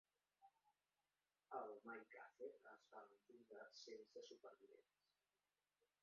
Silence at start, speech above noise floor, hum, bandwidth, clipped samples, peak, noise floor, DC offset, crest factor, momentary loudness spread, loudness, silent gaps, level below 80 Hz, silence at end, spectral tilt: 0.4 s; over 28 dB; 50 Hz at -105 dBFS; 7 kHz; under 0.1%; -38 dBFS; under -90 dBFS; under 0.1%; 24 dB; 11 LU; -60 LUFS; none; under -90 dBFS; 1.2 s; -1 dB/octave